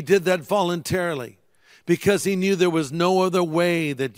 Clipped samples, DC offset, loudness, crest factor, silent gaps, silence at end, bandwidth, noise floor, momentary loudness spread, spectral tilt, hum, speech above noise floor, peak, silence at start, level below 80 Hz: under 0.1%; under 0.1%; -21 LUFS; 16 dB; none; 0.05 s; 16 kHz; -55 dBFS; 6 LU; -5.5 dB/octave; none; 34 dB; -4 dBFS; 0 s; -58 dBFS